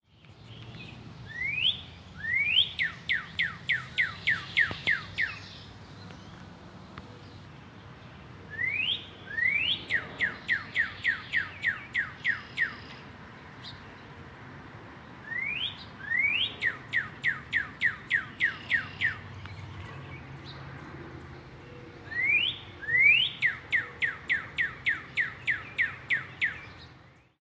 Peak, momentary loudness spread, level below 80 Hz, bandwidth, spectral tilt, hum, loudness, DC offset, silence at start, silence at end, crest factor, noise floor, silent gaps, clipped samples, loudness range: -12 dBFS; 22 LU; -58 dBFS; 9.4 kHz; -3.5 dB/octave; none; -28 LUFS; under 0.1%; 0.25 s; 0.3 s; 20 dB; -55 dBFS; none; under 0.1%; 11 LU